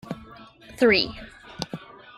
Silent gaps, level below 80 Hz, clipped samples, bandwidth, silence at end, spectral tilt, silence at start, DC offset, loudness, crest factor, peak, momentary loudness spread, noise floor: none; -52 dBFS; under 0.1%; 14.5 kHz; 0.35 s; -4.5 dB/octave; 0.05 s; under 0.1%; -23 LUFS; 20 dB; -8 dBFS; 23 LU; -47 dBFS